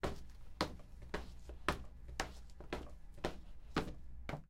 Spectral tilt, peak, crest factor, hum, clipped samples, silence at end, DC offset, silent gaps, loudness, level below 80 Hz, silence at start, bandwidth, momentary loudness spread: -4.5 dB/octave; -16 dBFS; 28 dB; none; under 0.1%; 0.05 s; under 0.1%; none; -45 LUFS; -52 dBFS; 0 s; 16 kHz; 15 LU